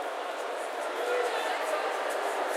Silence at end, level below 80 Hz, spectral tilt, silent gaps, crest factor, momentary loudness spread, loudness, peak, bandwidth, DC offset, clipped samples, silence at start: 0 s; under -90 dBFS; 1 dB/octave; none; 14 dB; 5 LU; -31 LUFS; -18 dBFS; 16 kHz; under 0.1%; under 0.1%; 0 s